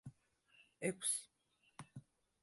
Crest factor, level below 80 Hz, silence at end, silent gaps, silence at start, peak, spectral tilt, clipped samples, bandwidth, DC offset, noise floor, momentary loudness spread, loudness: 22 dB; -82 dBFS; 0.4 s; none; 0.05 s; -26 dBFS; -3 dB/octave; under 0.1%; 12 kHz; under 0.1%; -79 dBFS; 23 LU; -41 LUFS